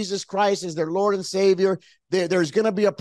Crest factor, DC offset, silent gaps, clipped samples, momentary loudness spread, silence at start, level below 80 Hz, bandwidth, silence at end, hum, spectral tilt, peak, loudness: 14 dB; under 0.1%; none; under 0.1%; 6 LU; 0 s; -70 dBFS; 12 kHz; 0.05 s; none; -5 dB/octave; -8 dBFS; -22 LUFS